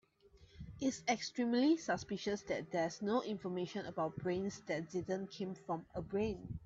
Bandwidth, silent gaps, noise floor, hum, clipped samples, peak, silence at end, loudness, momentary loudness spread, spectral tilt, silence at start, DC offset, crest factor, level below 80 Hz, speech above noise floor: 7.8 kHz; none; -66 dBFS; none; under 0.1%; -20 dBFS; 0 s; -39 LUFS; 9 LU; -5 dB/octave; 0.4 s; under 0.1%; 18 dB; -64 dBFS; 27 dB